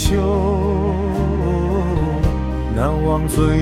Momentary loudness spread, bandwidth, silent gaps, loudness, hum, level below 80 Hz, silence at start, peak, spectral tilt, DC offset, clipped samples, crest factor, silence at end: 3 LU; 15.5 kHz; none; -19 LUFS; none; -24 dBFS; 0 s; -2 dBFS; -7 dB/octave; under 0.1%; under 0.1%; 14 dB; 0 s